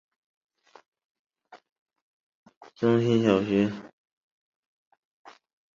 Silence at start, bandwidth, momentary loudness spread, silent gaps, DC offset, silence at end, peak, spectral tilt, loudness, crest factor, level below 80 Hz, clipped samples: 1.55 s; 7.4 kHz; 7 LU; 1.72-1.86 s, 2.02-2.43 s, 2.57-2.61 s; under 0.1%; 1.85 s; -8 dBFS; -7.5 dB/octave; -24 LUFS; 22 dB; -66 dBFS; under 0.1%